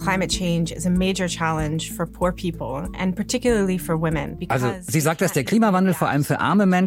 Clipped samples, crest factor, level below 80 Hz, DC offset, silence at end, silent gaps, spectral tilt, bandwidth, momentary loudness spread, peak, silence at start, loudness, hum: under 0.1%; 16 dB; -40 dBFS; under 0.1%; 0 s; none; -5.5 dB/octave; 16.5 kHz; 8 LU; -4 dBFS; 0 s; -22 LUFS; none